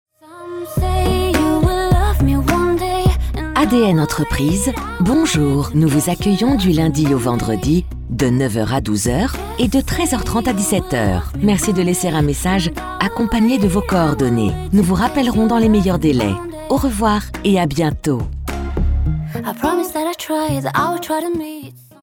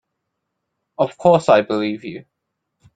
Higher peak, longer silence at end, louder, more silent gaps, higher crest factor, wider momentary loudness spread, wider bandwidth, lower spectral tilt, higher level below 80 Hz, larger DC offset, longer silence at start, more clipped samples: about the same, -2 dBFS vs -2 dBFS; second, 0.25 s vs 0.75 s; about the same, -17 LUFS vs -17 LUFS; neither; about the same, 14 dB vs 18 dB; second, 7 LU vs 19 LU; first, 18.5 kHz vs 9.2 kHz; about the same, -5.5 dB/octave vs -6.5 dB/octave; first, -26 dBFS vs -62 dBFS; neither; second, 0.3 s vs 1 s; neither